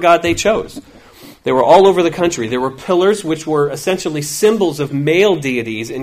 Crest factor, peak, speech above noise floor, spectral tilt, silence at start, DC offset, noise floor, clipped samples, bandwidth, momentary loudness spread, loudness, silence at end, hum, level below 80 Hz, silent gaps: 14 dB; 0 dBFS; 26 dB; -4.5 dB/octave; 0 s; under 0.1%; -40 dBFS; under 0.1%; 16 kHz; 10 LU; -14 LUFS; 0 s; none; -46 dBFS; none